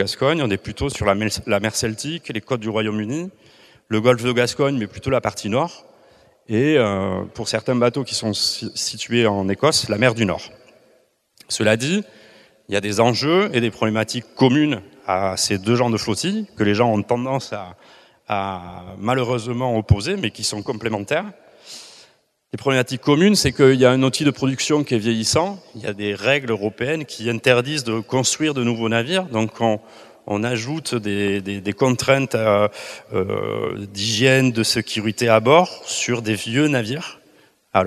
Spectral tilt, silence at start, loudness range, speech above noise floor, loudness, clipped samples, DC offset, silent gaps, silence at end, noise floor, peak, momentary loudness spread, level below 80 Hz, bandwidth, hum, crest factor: -4.5 dB/octave; 0 s; 5 LU; 39 dB; -20 LUFS; under 0.1%; under 0.1%; none; 0 s; -59 dBFS; 0 dBFS; 10 LU; -48 dBFS; 14.5 kHz; none; 20 dB